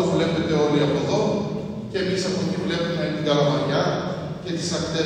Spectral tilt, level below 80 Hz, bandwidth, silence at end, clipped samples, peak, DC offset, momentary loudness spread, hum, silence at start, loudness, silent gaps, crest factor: -5.5 dB/octave; -52 dBFS; 10 kHz; 0 s; under 0.1%; -6 dBFS; under 0.1%; 9 LU; none; 0 s; -23 LUFS; none; 16 dB